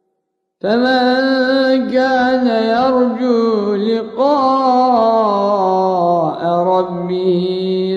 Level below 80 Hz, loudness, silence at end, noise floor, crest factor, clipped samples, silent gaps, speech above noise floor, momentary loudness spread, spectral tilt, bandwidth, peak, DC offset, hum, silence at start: -56 dBFS; -14 LUFS; 0 s; -71 dBFS; 12 dB; under 0.1%; none; 58 dB; 5 LU; -7 dB/octave; 7.6 kHz; -2 dBFS; under 0.1%; none; 0.65 s